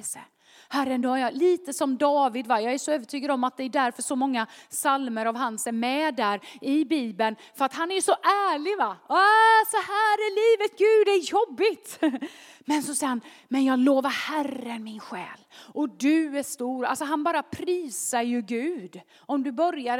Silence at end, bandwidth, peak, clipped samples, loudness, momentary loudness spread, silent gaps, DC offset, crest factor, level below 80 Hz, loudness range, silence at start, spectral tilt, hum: 0 s; 17.5 kHz; -8 dBFS; under 0.1%; -25 LUFS; 11 LU; none; under 0.1%; 18 dB; -78 dBFS; 7 LU; 0 s; -2.5 dB/octave; none